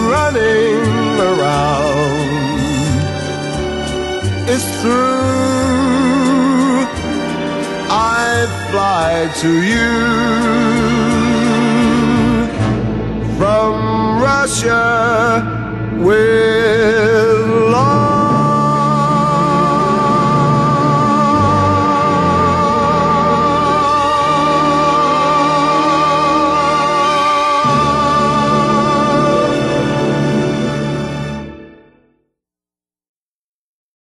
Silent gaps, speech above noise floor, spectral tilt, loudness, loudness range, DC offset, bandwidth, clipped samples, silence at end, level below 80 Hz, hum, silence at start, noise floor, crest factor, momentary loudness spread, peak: none; over 77 dB; -5.5 dB/octave; -13 LUFS; 4 LU; under 0.1%; 12 kHz; under 0.1%; 2.5 s; -36 dBFS; none; 0 s; under -90 dBFS; 12 dB; 7 LU; -2 dBFS